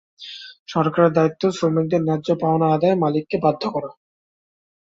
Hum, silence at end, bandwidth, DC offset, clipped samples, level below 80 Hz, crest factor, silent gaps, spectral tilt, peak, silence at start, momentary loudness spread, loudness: none; 0.95 s; 7.8 kHz; under 0.1%; under 0.1%; -60 dBFS; 18 dB; 0.59-0.66 s; -7.5 dB/octave; -4 dBFS; 0.2 s; 18 LU; -20 LUFS